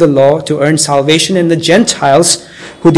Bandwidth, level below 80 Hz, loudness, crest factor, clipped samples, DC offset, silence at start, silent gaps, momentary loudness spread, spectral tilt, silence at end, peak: 12 kHz; -46 dBFS; -9 LUFS; 10 dB; 3%; under 0.1%; 0 s; none; 4 LU; -4 dB/octave; 0 s; 0 dBFS